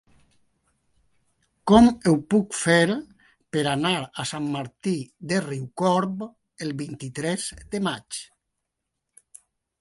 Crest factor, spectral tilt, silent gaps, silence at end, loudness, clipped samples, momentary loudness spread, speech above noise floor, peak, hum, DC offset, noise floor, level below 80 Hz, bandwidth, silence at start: 22 dB; -5 dB/octave; none; 1.55 s; -24 LUFS; under 0.1%; 15 LU; 58 dB; -2 dBFS; none; under 0.1%; -81 dBFS; -52 dBFS; 11.5 kHz; 1.65 s